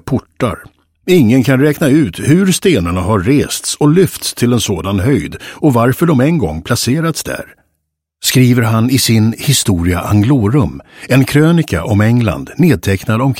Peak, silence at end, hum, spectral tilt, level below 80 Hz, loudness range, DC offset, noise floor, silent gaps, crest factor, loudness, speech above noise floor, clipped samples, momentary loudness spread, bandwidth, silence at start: 0 dBFS; 0 s; none; -5.5 dB/octave; -36 dBFS; 2 LU; under 0.1%; -70 dBFS; none; 12 dB; -12 LUFS; 58 dB; under 0.1%; 7 LU; 16.5 kHz; 0.05 s